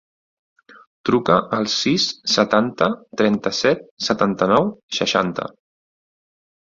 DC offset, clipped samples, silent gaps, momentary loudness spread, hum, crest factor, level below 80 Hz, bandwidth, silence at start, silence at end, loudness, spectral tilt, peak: under 0.1%; under 0.1%; 3.91-3.97 s, 4.83-4.89 s; 7 LU; none; 20 dB; -58 dBFS; 7.6 kHz; 1.05 s; 1.15 s; -19 LUFS; -4.5 dB/octave; -2 dBFS